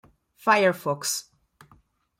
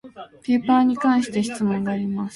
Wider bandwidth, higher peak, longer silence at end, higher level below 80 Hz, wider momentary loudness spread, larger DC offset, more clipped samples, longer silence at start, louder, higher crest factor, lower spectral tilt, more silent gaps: first, 16.5 kHz vs 11.5 kHz; about the same, -8 dBFS vs -6 dBFS; first, 1 s vs 0 s; second, -70 dBFS vs -60 dBFS; about the same, 9 LU vs 9 LU; neither; neither; first, 0.45 s vs 0.05 s; second, -24 LUFS vs -21 LUFS; first, 20 dB vs 14 dB; second, -3 dB/octave vs -6 dB/octave; neither